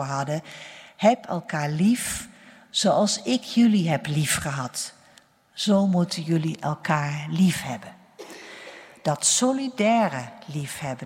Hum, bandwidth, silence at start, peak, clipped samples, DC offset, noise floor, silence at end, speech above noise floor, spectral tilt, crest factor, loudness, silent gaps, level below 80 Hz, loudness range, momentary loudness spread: none; 16 kHz; 0 s; -6 dBFS; under 0.1%; under 0.1%; -56 dBFS; 0 s; 33 dB; -4.5 dB/octave; 20 dB; -24 LUFS; none; -60 dBFS; 2 LU; 20 LU